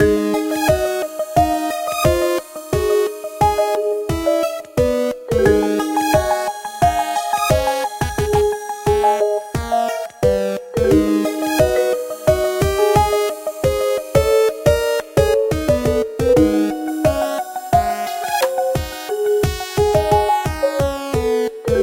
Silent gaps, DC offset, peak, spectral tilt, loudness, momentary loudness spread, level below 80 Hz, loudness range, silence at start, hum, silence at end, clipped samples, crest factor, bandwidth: none; under 0.1%; -2 dBFS; -5.5 dB/octave; -18 LUFS; 6 LU; -32 dBFS; 2 LU; 0 s; none; 0 s; under 0.1%; 16 dB; 16.5 kHz